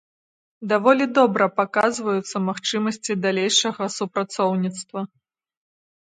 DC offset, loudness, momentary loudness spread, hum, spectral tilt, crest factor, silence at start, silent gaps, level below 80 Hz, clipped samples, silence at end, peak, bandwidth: under 0.1%; -21 LUFS; 11 LU; none; -4 dB/octave; 20 dB; 0.6 s; none; -72 dBFS; under 0.1%; 0.95 s; -2 dBFS; 9.6 kHz